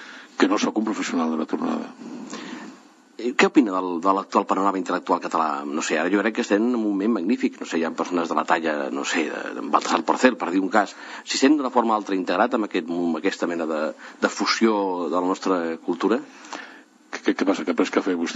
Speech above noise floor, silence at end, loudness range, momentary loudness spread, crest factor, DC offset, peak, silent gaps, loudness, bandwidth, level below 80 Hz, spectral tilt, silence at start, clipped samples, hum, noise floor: 26 dB; 0 s; 3 LU; 11 LU; 20 dB; under 0.1%; -2 dBFS; none; -23 LUFS; 8.4 kHz; -74 dBFS; -4 dB/octave; 0 s; under 0.1%; none; -48 dBFS